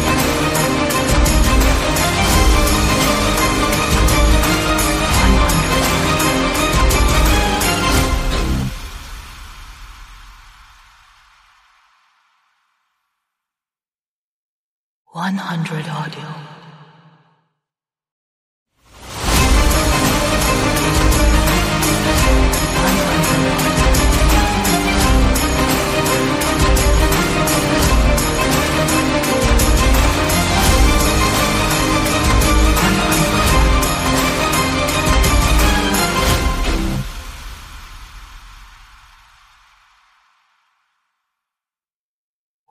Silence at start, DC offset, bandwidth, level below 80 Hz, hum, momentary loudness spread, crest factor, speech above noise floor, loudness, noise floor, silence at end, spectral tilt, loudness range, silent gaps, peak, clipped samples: 0 s; under 0.1%; 15.5 kHz; -20 dBFS; none; 9 LU; 14 dB; over 67 dB; -15 LUFS; under -90 dBFS; 4.05 s; -4 dB/octave; 13 LU; 13.95-15.05 s, 18.12-18.66 s; -2 dBFS; under 0.1%